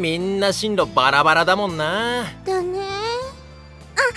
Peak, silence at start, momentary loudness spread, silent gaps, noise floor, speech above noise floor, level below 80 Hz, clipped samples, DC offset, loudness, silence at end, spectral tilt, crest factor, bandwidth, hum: 0 dBFS; 0 s; 11 LU; none; -41 dBFS; 22 dB; -48 dBFS; under 0.1%; under 0.1%; -20 LUFS; 0 s; -4 dB/octave; 20 dB; 11 kHz; none